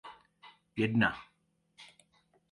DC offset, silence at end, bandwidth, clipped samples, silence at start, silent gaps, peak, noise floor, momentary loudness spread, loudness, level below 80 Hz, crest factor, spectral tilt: under 0.1%; 0.7 s; 11 kHz; under 0.1%; 0.05 s; none; -14 dBFS; -75 dBFS; 27 LU; -31 LUFS; -66 dBFS; 24 dB; -7 dB/octave